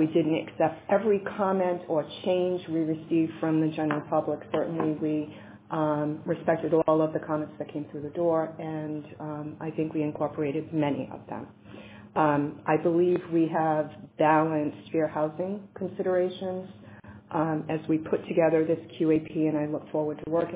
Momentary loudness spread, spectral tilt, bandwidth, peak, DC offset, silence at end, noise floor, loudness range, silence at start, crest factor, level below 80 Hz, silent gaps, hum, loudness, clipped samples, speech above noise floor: 12 LU; -11 dB/octave; 4 kHz; -10 dBFS; under 0.1%; 0 s; -47 dBFS; 5 LU; 0 s; 18 dB; -66 dBFS; none; none; -28 LUFS; under 0.1%; 20 dB